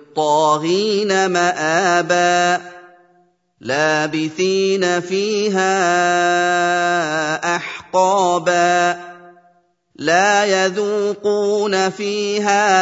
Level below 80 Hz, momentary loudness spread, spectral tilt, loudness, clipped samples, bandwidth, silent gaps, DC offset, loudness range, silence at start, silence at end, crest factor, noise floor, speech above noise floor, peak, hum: -70 dBFS; 5 LU; -3.5 dB/octave; -16 LUFS; under 0.1%; 8 kHz; none; under 0.1%; 2 LU; 0.15 s; 0 s; 16 dB; -58 dBFS; 41 dB; -2 dBFS; none